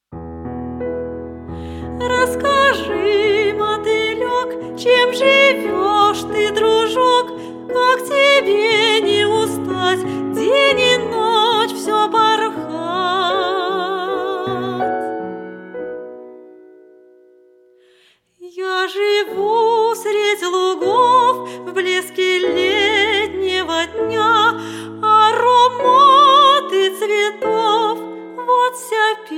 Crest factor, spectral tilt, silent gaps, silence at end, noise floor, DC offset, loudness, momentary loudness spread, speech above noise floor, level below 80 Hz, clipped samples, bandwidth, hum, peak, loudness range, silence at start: 16 dB; -3.5 dB/octave; none; 0 s; -55 dBFS; under 0.1%; -15 LUFS; 15 LU; 40 dB; -48 dBFS; under 0.1%; 16.5 kHz; none; 0 dBFS; 11 LU; 0.1 s